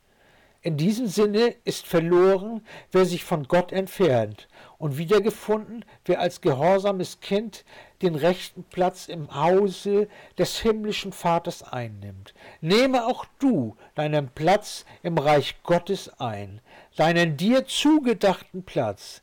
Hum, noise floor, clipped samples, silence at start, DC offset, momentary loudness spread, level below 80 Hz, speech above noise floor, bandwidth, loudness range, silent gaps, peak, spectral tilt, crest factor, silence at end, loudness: none; -58 dBFS; under 0.1%; 0.65 s; under 0.1%; 13 LU; -54 dBFS; 34 dB; 18.5 kHz; 3 LU; none; -14 dBFS; -5.5 dB/octave; 10 dB; 0.05 s; -24 LUFS